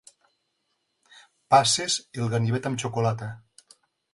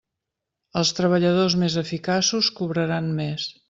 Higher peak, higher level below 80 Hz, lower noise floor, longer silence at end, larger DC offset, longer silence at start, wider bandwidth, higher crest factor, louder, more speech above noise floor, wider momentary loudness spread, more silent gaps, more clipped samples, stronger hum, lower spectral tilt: about the same, -6 dBFS vs -8 dBFS; about the same, -62 dBFS vs -60 dBFS; second, -76 dBFS vs -84 dBFS; first, 0.75 s vs 0.2 s; neither; first, 1.5 s vs 0.75 s; first, 11.5 kHz vs 7.8 kHz; first, 22 dB vs 16 dB; about the same, -24 LUFS vs -22 LUFS; second, 51 dB vs 61 dB; first, 15 LU vs 7 LU; neither; neither; neither; about the same, -4 dB/octave vs -4.5 dB/octave